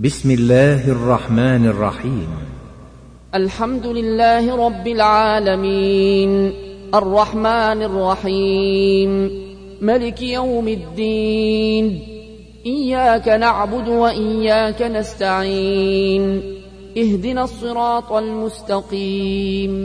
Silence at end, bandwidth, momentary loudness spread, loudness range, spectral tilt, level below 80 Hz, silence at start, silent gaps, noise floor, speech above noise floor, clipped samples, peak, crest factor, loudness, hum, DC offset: 0 s; 10.5 kHz; 10 LU; 4 LU; -6.5 dB/octave; -38 dBFS; 0 s; none; -40 dBFS; 24 dB; under 0.1%; -2 dBFS; 16 dB; -17 LUFS; 60 Hz at -35 dBFS; under 0.1%